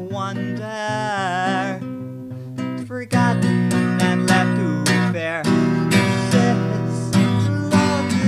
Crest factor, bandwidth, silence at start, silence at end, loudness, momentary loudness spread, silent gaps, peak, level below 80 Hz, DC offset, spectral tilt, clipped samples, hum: 18 dB; 14 kHz; 0 s; 0 s; -19 LUFS; 11 LU; none; -2 dBFS; -58 dBFS; under 0.1%; -6 dB/octave; under 0.1%; none